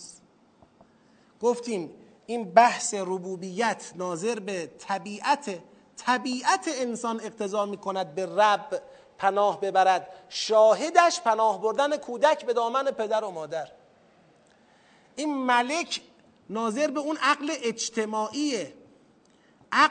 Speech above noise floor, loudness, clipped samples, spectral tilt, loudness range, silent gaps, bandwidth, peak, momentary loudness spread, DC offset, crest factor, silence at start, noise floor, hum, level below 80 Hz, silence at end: 35 dB; -26 LUFS; under 0.1%; -3 dB/octave; 7 LU; none; 9.4 kHz; -2 dBFS; 13 LU; under 0.1%; 24 dB; 0 s; -60 dBFS; none; -80 dBFS; 0 s